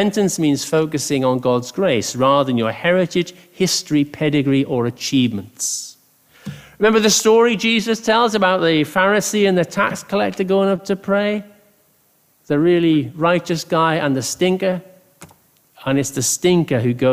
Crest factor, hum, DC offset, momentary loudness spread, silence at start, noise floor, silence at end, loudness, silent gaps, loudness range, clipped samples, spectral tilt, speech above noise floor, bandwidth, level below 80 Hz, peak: 16 dB; none; under 0.1%; 8 LU; 0 s; -58 dBFS; 0 s; -17 LUFS; none; 4 LU; under 0.1%; -4.5 dB/octave; 42 dB; 15.5 kHz; -56 dBFS; -2 dBFS